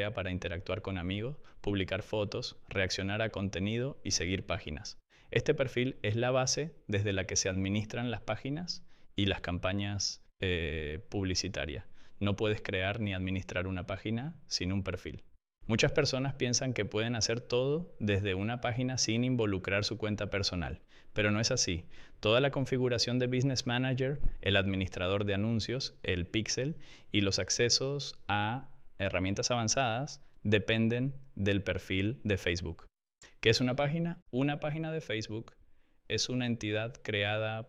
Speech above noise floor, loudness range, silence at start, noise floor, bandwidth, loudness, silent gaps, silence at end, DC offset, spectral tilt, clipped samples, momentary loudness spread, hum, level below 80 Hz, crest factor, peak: 28 dB; 4 LU; 0 s; -60 dBFS; 11.5 kHz; -33 LUFS; 34.22-34.26 s; 0 s; under 0.1%; -4.5 dB/octave; under 0.1%; 9 LU; none; -50 dBFS; 20 dB; -12 dBFS